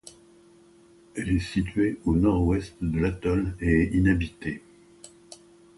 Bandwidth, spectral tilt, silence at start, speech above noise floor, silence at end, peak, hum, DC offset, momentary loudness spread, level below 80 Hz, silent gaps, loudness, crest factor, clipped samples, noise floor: 11.5 kHz; -7.5 dB/octave; 0.05 s; 31 dB; 0.45 s; -8 dBFS; none; under 0.1%; 13 LU; -38 dBFS; none; -26 LUFS; 18 dB; under 0.1%; -55 dBFS